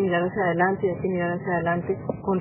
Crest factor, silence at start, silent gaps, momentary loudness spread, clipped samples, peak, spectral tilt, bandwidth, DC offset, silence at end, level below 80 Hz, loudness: 18 dB; 0 s; none; 5 LU; under 0.1%; -8 dBFS; -11 dB/octave; 3.2 kHz; under 0.1%; 0 s; -52 dBFS; -25 LUFS